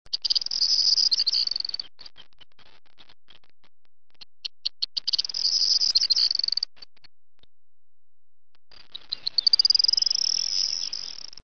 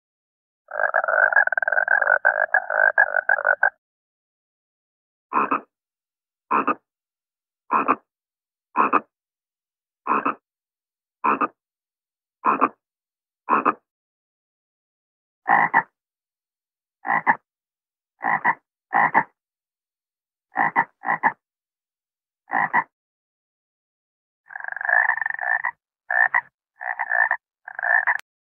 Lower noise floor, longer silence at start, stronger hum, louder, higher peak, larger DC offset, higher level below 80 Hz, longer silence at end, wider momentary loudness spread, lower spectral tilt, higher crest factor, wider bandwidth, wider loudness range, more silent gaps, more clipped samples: about the same, under -90 dBFS vs under -90 dBFS; second, 0.15 s vs 0.7 s; neither; about the same, -21 LUFS vs -21 LUFS; second, -8 dBFS vs -2 dBFS; first, 0.9% vs under 0.1%; first, -66 dBFS vs -76 dBFS; second, 0 s vs 0.35 s; first, 16 LU vs 13 LU; second, 3 dB/octave vs -7 dB/octave; about the same, 20 dB vs 24 dB; first, 7.6 kHz vs 6 kHz; about the same, 10 LU vs 8 LU; second, none vs 3.78-5.30 s, 13.91-15.42 s, 22.93-24.44 s, 26.54-26.58 s; neither